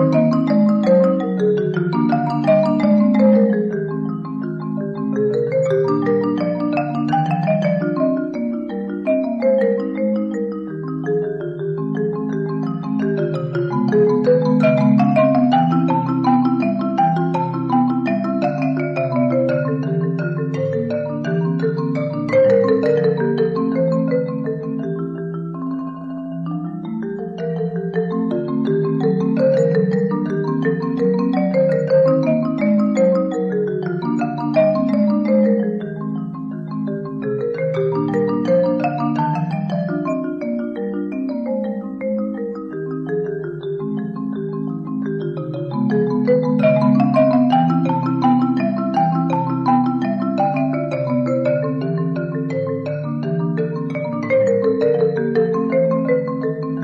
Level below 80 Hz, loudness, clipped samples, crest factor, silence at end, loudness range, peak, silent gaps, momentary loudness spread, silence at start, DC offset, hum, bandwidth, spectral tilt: -60 dBFS; -19 LUFS; under 0.1%; 14 dB; 0 s; 7 LU; -4 dBFS; none; 10 LU; 0 s; under 0.1%; none; 7.4 kHz; -9.5 dB/octave